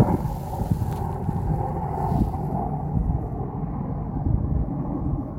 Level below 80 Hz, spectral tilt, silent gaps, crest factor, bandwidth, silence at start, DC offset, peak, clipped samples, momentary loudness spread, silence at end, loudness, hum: -32 dBFS; -10 dB/octave; none; 18 dB; 16 kHz; 0 s; under 0.1%; -6 dBFS; under 0.1%; 5 LU; 0 s; -27 LUFS; none